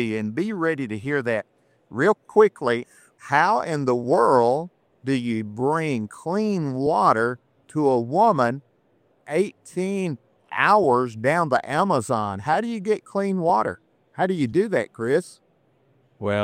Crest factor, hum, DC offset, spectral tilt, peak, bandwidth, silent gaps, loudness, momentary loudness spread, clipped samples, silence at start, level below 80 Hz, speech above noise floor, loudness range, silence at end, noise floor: 20 dB; none; under 0.1%; -6.5 dB/octave; -4 dBFS; 14.5 kHz; none; -22 LUFS; 10 LU; under 0.1%; 0 s; -66 dBFS; 41 dB; 3 LU; 0 s; -63 dBFS